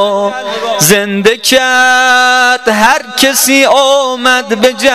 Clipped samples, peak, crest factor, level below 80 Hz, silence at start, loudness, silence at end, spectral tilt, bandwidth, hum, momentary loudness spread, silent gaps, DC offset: 0.6%; 0 dBFS; 8 dB; -46 dBFS; 0 s; -8 LUFS; 0 s; -2 dB/octave; 16.5 kHz; none; 5 LU; none; 0.6%